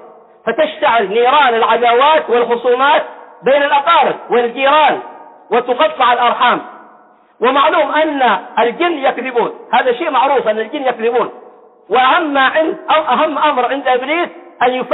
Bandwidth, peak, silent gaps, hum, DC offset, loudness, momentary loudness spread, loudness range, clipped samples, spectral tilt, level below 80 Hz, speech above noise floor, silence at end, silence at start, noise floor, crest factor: 4.1 kHz; -2 dBFS; none; none; under 0.1%; -13 LUFS; 7 LU; 3 LU; under 0.1%; -8 dB/octave; -62 dBFS; 33 dB; 0 s; 0.05 s; -45 dBFS; 12 dB